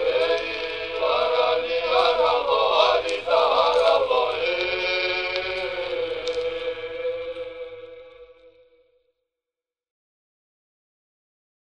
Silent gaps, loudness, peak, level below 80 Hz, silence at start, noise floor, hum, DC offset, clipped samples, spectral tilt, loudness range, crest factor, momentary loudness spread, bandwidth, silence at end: none; -22 LUFS; -4 dBFS; -56 dBFS; 0 s; under -90 dBFS; none; 0.2%; under 0.1%; -3 dB/octave; 15 LU; 20 dB; 12 LU; 9.6 kHz; 3.4 s